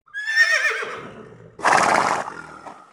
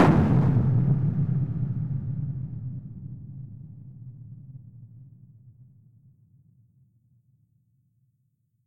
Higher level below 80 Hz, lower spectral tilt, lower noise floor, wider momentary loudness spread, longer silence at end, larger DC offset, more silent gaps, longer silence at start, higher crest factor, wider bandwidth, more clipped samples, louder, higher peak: second, -62 dBFS vs -48 dBFS; second, -2 dB/octave vs -10 dB/octave; second, -42 dBFS vs -72 dBFS; about the same, 22 LU vs 24 LU; second, 0.2 s vs 2.95 s; neither; neither; first, 0.15 s vs 0 s; about the same, 20 dB vs 22 dB; first, over 20 kHz vs 6 kHz; neither; first, -19 LUFS vs -25 LUFS; first, -2 dBFS vs -6 dBFS